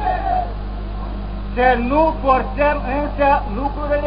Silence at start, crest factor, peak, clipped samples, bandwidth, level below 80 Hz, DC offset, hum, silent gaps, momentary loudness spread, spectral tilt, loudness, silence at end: 0 s; 16 dB; -2 dBFS; under 0.1%; 5.2 kHz; -26 dBFS; under 0.1%; 50 Hz at -25 dBFS; none; 12 LU; -11.5 dB/octave; -19 LUFS; 0 s